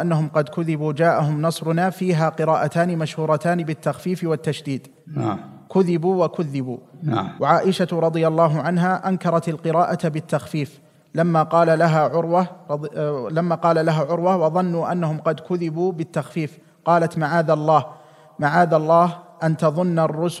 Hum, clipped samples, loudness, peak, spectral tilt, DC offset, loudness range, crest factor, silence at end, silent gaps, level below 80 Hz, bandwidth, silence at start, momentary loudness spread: none; under 0.1%; -20 LUFS; -2 dBFS; -7.5 dB/octave; under 0.1%; 4 LU; 18 dB; 0 s; none; -70 dBFS; 12.5 kHz; 0 s; 9 LU